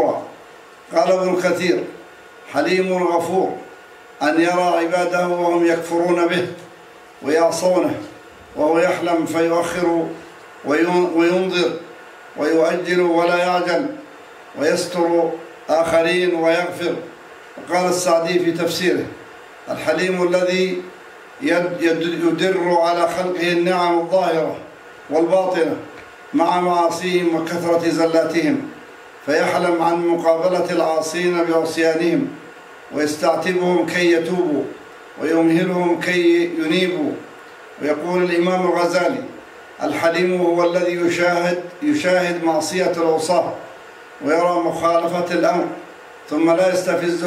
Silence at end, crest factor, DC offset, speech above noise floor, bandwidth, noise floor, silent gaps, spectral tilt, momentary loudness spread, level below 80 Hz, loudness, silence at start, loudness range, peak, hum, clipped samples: 0 s; 16 dB; under 0.1%; 25 dB; 15 kHz; -42 dBFS; none; -5 dB/octave; 15 LU; -64 dBFS; -18 LUFS; 0 s; 2 LU; -2 dBFS; none; under 0.1%